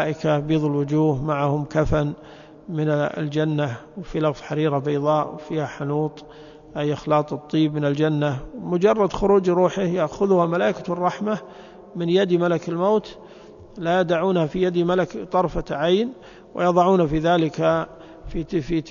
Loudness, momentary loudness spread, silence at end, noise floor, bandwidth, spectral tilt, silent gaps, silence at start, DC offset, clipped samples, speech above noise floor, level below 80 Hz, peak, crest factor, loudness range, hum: -22 LUFS; 11 LU; 0 s; -44 dBFS; 7.2 kHz; -7.5 dB/octave; none; 0 s; under 0.1%; under 0.1%; 22 dB; -44 dBFS; -4 dBFS; 18 dB; 4 LU; none